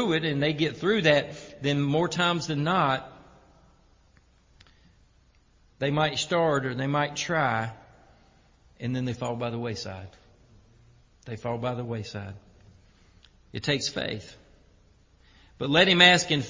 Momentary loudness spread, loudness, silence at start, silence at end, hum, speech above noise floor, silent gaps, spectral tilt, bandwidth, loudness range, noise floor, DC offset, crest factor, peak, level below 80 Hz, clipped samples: 16 LU; -25 LUFS; 0 s; 0 s; none; 35 dB; none; -4.5 dB/octave; 7.6 kHz; 11 LU; -61 dBFS; under 0.1%; 24 dB; -4 dBFS; -58 dBFS; under 0.1%